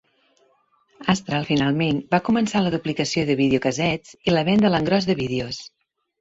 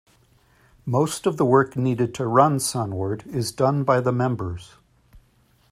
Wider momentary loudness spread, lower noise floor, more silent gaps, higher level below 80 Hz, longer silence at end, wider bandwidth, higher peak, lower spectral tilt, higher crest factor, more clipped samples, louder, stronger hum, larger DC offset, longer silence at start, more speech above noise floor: second, 7 LU vs 10 LU; about the same, -63 dBFS vs -60 dBFS; neither; about the same, -52 dBFS vs -56 dBFS; about the same, 0.55 s vs 0.55 s; second, 8 kHz vs 15.5 kHz; about the same, -2 dBFS vs -2 dBFS; about the same, -5.5 dB/octave vs -6 dB/octave; about the same, 20 dB vs 22 dB; neither; about the same, -21 LUFS vs -22 LUFS; neither; neither; first, 1 s vs 0.85 s; about the same, 42 dB vs 39 dB